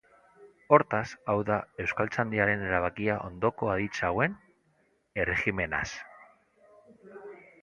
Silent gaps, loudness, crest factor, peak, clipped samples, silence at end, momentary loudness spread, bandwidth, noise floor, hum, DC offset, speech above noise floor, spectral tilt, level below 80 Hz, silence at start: none; -29 LUFS; 26 dB; -4 dBFS; under 0.1%; 0.25 s; 21 LU; 10.5 kHz; -70 dBFS; none; under 0.1%; 41 dB; -6.5 dB/octave; -54 dBFS; 0.4 s